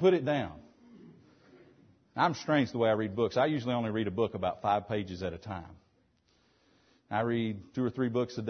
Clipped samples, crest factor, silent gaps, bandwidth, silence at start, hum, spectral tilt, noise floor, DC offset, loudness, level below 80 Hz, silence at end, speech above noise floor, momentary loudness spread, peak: under 0.1%; 18 dB; none; 6.6 kHz; 0 s; none; -7 dB/octave; -70 dBFS; under 0.1%; -31 LUFS; -64 dBFS; 0 s; 40 dB; 10 LU; -14 dBFS